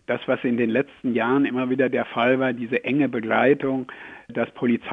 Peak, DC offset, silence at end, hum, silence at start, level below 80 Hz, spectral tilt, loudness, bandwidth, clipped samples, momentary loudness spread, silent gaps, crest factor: -6 dBFS; under 0.1%; 0 s; none; 0.1 s; -64 dBFS; -8.5 dB/octave; -22 LUFS; 3.9 kHz; under 0.1%; 8 LU; none; 16 dB